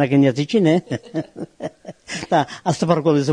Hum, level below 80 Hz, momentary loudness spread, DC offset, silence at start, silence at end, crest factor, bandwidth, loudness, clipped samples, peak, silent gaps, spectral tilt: none; -58 dBFS; 16 LU; under 0.1%; 0 s; 0 s; 18 dB; 10.5 kHz; -19 LUFS; under 0.1%; -2 dBFS; none; -6.5 dB/octave